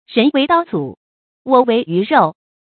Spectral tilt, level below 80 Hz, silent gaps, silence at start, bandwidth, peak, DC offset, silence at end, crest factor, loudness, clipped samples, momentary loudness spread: -10 dB/octave; -60 dBFS; 0.97-1.45 s; 0.1 s; 4.6 kHz; 0 dBFS; under 0.1%; 0.3 s; 16 dB; -15 LUFS; under 0.1%; 11 LU